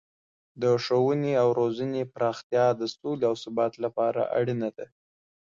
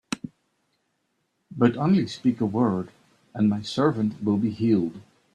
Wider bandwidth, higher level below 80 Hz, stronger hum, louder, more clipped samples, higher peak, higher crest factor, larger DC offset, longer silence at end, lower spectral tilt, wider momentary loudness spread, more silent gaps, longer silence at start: second, 7.4 kHz vs 10 kHz; second, -70 dBFS vs -64 dBFS; neither; second, -27 LUFS vs -24 LUFS; neither; second, -12 dBFS vs -6 dBFS; about the same, 16 dB vs 20 dB; neither; first, 0.65 s vs 0.35 s; about the same, -6.5 dB/octave vs -7 dB/octave; second, 8 LU vs 13 LU; first, 2.44-2.50 s vs none; first, 0.55 s vs 0.1 s